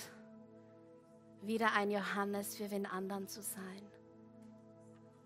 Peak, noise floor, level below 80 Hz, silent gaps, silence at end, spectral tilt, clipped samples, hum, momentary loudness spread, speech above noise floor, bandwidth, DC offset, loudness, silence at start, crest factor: -16 dBFS; -61 dBFS; -86 dBFS; none; 0.05 s; -4 dB/octave; under 0.1%; none; 26 LU; 22 dB; 16 kHz; under 0.1%; -39 LUFS; 0 s; 26 dB